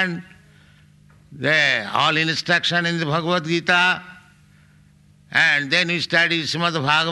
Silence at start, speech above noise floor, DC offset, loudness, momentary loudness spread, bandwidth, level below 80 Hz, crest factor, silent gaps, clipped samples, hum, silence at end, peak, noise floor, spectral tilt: 0 s; 33 dB; under 0.1%; -18 LUFS; 6 LU; 12 kHz; -62 dBFS; 18 dB; none; under 0.1%; none; 0 s; -4 dBFS; -52 dBFS; -4 dB/octave